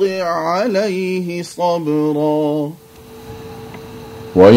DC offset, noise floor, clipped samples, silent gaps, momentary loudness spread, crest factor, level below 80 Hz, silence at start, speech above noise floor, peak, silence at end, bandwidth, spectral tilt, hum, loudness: under 0.1%; -36 dBFS; 0.2%; none; 17 LU; 16 dB; -50 dBFS; 0 s; 18 dB; 0 dBFS; 0 s; 16 kHz; -6.5 dB/octave; none; -17 LUFS